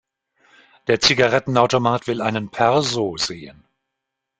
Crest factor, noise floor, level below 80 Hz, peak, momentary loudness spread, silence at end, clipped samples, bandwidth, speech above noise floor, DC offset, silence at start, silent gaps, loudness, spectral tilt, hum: 20 dB; -81 dBFS; -54 dBFS; 0 dBFS; 10 LU; 0.9 s; under 0.1%; 9.4 kHz; 62 dB; under 0.1%; 0.9 s; none; -19 LUFS; -4 dB/octave; none